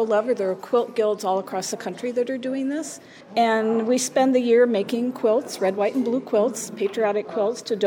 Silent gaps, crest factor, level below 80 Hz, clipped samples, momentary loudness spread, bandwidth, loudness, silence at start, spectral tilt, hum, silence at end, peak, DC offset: none; 14 dB; -78 dBFS; under 0.1%; 9 LU; 19 kHz; -23 LUFS; 0 s; -4 dB/octave; none; 0 s; -8 dBFS; under 0.1%